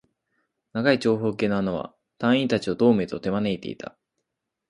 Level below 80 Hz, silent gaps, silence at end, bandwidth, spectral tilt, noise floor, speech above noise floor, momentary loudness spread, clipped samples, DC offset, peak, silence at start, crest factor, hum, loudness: -58 dBFS; none; 0.95 s; 11 kHz; -6.5 dB/octave; -82 dBFS; 59 dB; 14 LU; under 0.1%; under 0.1%; -6 dBFS; 0.75 s; 20 dB; none; -24 LUFS